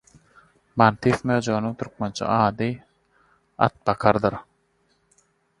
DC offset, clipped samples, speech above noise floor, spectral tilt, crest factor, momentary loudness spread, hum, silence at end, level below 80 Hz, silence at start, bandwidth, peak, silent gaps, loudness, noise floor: under 0.1%; under 0.1%; 45 dB; -6.5 dB/octave; 24 dB; 11 LU; none; 1.2 s; -54 dBFS; 0.75 s; 11.5 kHz; 0 dBFS; none; -23 LUFS; -67 dBFS